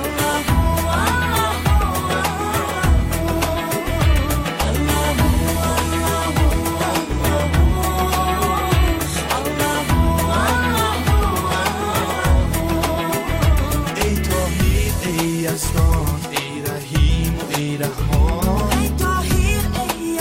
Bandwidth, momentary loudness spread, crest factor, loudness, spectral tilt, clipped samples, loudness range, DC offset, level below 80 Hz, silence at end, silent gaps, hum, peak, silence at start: 16.5 kHz; 4 LU; 14 dB; -19 LUFS; -5 dB/octave; under 0.1%; 2 LU; under 0.1%; -22 dBFS; 0 s; none; none; -4 dBFS; 0 s